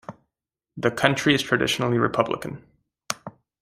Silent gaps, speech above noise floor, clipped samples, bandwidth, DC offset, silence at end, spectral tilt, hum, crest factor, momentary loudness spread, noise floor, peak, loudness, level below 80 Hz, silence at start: none; 63 dB; under 0.1%; 15.5 kHz; under 0.1%; 0.3 s; -4.5 dB/octave; none; 24 dB; 18 LU; -86 dBFS; -2 dBFS; -23 LUFS; -58 dBFS; 0.1 s